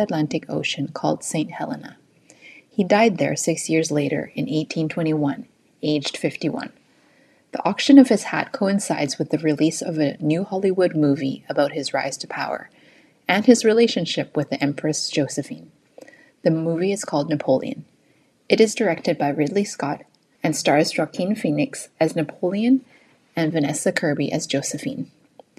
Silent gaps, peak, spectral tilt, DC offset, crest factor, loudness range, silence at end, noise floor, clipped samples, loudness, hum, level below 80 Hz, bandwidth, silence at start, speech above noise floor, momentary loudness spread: none; 0 dBFS; -5 dB/octave; under 0.1%; 22 dB; 5 LU; 0.5 s; -60 dBFS; under 0.1%; -21 LUFS; none; -70 dBFS; 13.5 kHz; 0 s; 39 dB; 11 LU